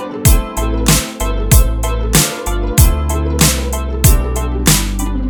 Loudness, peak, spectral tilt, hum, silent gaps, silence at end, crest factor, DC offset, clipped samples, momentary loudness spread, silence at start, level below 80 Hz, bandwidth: -14 LUFS; 0 dBFS; -4 dB/octave; none; none; 0 s; 12 dB; under 0.1%; under 0.1%; 7 LU; 0 s; -16 dBFS; over 20 kHz